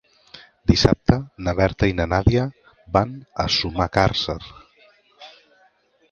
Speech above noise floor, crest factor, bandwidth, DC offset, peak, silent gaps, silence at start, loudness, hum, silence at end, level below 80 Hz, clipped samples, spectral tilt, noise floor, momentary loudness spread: 40 dB; 22 dB; 7.2 kHz; under 0.1%; 0 dBFS; none; 0.35 s; -21 LUFS; none; 0.8 s; -34 dBFS; under 0.1%; -6 dB/octave; -60 dBFS; 10 LU